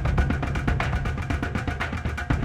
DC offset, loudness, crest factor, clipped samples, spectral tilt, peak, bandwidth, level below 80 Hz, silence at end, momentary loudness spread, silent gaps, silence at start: under 0.1%; -27 LUFS; 16 dB; under 0.1%; -6.5 dB/octave; -8 dBFS; 11.5 kHz; -30 dBFS; 0 s; 4 LU; none; 0 s